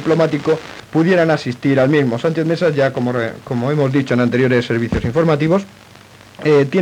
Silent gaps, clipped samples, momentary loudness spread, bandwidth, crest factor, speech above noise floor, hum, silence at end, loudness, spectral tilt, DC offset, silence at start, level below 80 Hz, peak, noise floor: none; under 0.1%; 8 LU; 12.5 kHz; 14 dB; 27 dB; none; 0 s; -16 LUFS; -7.5 dB/octave; under 0.1%; 0 s; -44 dBFS; -2 dBFS; -42 dBFS